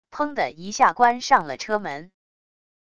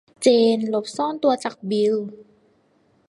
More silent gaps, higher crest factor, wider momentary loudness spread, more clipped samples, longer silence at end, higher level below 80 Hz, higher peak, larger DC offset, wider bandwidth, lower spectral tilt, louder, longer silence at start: neither; about the same, 20 dB vs 18 dB; about the same, 11 LU vs 9 LU; neither; about the same, 0.8 s vs 0.85 s; first, -62 dBFS vs -72 dBFS; about the same, -4 dBFS vs -4 dBFS; neither; second, 10 kHz vs 11.5 kHz; second, -3 dB/octave vs -5 dB/octave; about the same, -21 LUFS vs -21 LUFS; about the same, 0.1 s vs 0.2 s